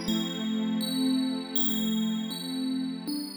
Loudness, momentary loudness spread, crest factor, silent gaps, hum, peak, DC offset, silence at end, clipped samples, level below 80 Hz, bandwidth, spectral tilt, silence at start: -29 LUFS; 7 LU; 14 dB; none; none; -14 dBFS; under 0.1%; 0 s; under 0.1%; -66 dBFS; over 20 kHz; -4.5 dB/octave; 0 s